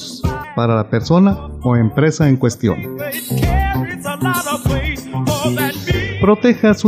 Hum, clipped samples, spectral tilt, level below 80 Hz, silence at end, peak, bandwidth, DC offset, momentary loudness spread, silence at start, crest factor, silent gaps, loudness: none; under 0.1%; -6 dB/octave; -28 dBFS; 0 s; -2 dBFS; 15.5 kHz; under 0.1%; 9 LU; 0 s; 14 dB; none; -16 LUFS